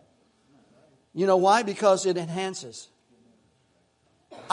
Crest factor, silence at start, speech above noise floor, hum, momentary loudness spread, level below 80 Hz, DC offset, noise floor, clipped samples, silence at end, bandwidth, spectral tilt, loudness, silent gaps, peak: 20 dB; 1.15 s; 43 dB; none; 20 LU; -78 dBFS; under 0.1%; -67 dBFS; under 0.1%; 0 s; 11 kHz; -4.5 dB/octave; -23 LUFS; none; -8 dBFS